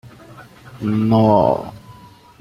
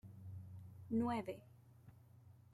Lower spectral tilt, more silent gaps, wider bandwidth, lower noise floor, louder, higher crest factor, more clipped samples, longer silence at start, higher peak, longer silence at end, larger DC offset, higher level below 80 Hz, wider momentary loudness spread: about the same, -9 dB/octave vs -8 dB/octave; neither; about the same, 13 kHz vs 13 kHz; second, -43 dBFS vs -64 dBFS; first, -16 LUFS vs -44 LUFS; about the same, 18 dB vs 18 dB; neither; about the same, 0.05 s vs 0.05 s; first, -2 dBFS vs -28 dBFS; first, 0.5 s vs 0.15 s; neither; first, -50 dBFS vs -76 dBFS; second, 13 LU vs 25 LU